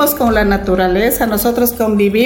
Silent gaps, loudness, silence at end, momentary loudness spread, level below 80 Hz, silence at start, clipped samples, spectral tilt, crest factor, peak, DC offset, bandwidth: none; -13 LUFS; 0 s; 2 LU; -28 dBFS; 0 s; under 0.1%; -5 dB/octave; 10 dB; -2 dBFS; under 0.1%; 17 kHz